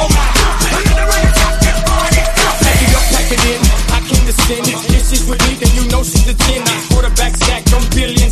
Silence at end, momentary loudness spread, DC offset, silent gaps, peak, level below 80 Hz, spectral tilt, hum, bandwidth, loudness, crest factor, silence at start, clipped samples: 0 s; 3 LU; under 0.1%; none; 0 dBFS; -12 dBFS; -3.5 dB/octave; none; 14 kHz; -12 LUFS; 10 dB; 0 s; under 0.1%